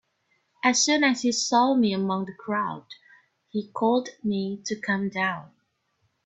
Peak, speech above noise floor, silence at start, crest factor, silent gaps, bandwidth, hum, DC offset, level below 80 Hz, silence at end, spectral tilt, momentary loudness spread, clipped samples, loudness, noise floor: -6 dBFS; 48 dB; 0.65 s; 20 dB; none; 8.4 kHz; none; under 0.1%; -70 dBFS; 0.8 s; -3.5 dB/octave; 12 LU; under 0.1%; -25 LUFS; -72 dBFS